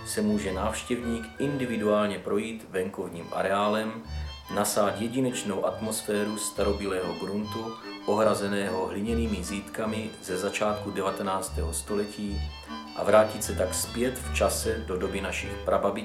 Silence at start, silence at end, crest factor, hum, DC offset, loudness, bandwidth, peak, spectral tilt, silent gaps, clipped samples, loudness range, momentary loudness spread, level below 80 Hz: 0 s; 0 s; 20 dB; none; under 0.1%; -29 LUFS; 16 kHz; -8 dBFS; -4.5 dB/octave; none; under 0.1%; 3 LU; 9 LU; -42 dBFS